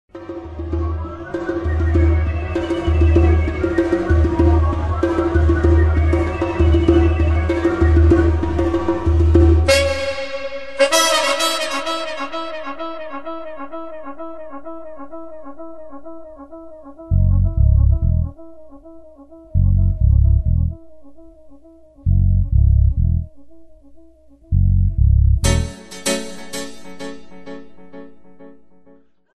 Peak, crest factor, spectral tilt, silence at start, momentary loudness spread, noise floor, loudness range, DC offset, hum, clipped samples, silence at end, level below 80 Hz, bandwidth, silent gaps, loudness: 0 dBFS; 18 dB; -6 dB/octave; 0.1 s; 21 LU; -51 dBFS; 13 LU; 0.5%; none; under 0.1%; 0 s; -20 dBFS; 12 kHz; none; -17 LUFS